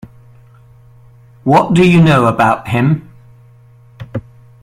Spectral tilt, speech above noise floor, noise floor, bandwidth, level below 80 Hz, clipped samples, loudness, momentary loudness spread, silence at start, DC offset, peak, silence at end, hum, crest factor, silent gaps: -7.5 dB/octave; 33 dB; -43 dBFS; 11.5 kHz; -44 dBFS; under 0.1%; -11 LUFS; 19 LU; 1.45 s; under 0.1%; 0 dBFS; 0.45 s; none; 14 dB; none